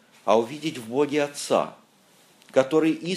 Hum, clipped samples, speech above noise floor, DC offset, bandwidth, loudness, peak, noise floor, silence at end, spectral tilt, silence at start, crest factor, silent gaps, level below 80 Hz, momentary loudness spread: none; under 0.1%; 34 dB; under 0.1%; 14.5 kHz; -24 LUFS; -4 dBFS; -58 dBFS; 0 s; -5 dB/octave; 0.25 s; 20 dB; none; -76 dBFS; 8 LU